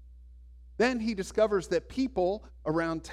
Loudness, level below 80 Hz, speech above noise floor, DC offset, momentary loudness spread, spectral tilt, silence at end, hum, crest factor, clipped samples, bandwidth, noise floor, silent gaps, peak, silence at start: -30 LUFS; -50 dBFS; 21 dB; under 0.1%; 5 LU; -5.5 dB/octave; 0 s; none; 18 dB; under 0.1%; 13.5 kHz; -50 dBFS; none; -14 dBFS; 0 s